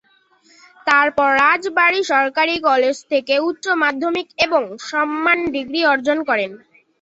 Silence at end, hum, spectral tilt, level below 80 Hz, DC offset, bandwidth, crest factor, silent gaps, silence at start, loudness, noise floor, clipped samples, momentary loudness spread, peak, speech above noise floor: 0.45 s; none; -3 dB/octave; -58 dBFS; under 0.1%; 8.2 kHz; 16 dB; none; 0.85 s; -17 LUFS; -56 dBFS; under 0.1%; 7 LU; -2 dBFS; 38 dB